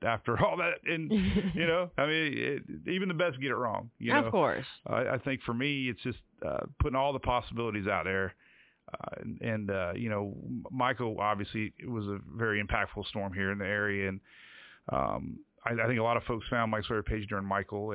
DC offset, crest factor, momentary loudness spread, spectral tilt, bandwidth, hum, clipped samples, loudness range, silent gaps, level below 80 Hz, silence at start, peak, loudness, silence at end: under 0.1%; 20 dB; 10 LU; -4 dB/octave; 4 kHz; none; under 0.1%; 4 LU; none; -48 dBFS; 0 s; -12 dBFS; -32 LUFS; 0 s